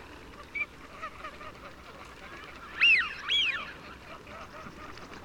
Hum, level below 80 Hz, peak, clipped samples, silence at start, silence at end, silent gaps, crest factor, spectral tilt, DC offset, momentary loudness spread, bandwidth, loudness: none; -58 dBFS; -14 dBFS; under 0.1%; 0 s; 0 s; none; 20 dB; -1.5 dB/octave; under 0.1%; 25 LU; 19 kHz; -26 LUFS